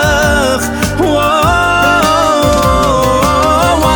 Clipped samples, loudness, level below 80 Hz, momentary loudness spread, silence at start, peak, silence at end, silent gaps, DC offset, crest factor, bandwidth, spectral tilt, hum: under 0.1%; -10 LUFS; -22 dBFS; 3 LU; 0 s; 0 dBFS; 0 s; none; under 0.1%; 10 dB; 19.5 kHz; -4.5 dB/octave; none